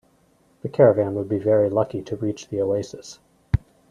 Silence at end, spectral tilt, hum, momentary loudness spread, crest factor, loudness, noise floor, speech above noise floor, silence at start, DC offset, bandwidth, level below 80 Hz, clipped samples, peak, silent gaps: 0.3 s; -7.5 dB/octave; none; 18 LU; 20 dB; -22 LUFS; -60 dBFS; 39 dB; 0.65 s; under 0.1%; 10 kHz; -42 dBFS; under 0.1%; -4 dBFS; none